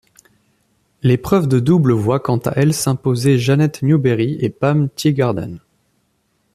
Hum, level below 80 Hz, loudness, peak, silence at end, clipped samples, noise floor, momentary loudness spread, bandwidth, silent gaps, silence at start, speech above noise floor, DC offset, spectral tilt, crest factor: none; -50 dBFS; -16 LUFS; -2 dBFS; 0.95 s; under 0.1%; -64 dBFS; 5 LU; 14.5 kHz; none; 1.05 s; 49 dB; under 0.1%; -7 dB/octave; 14 dB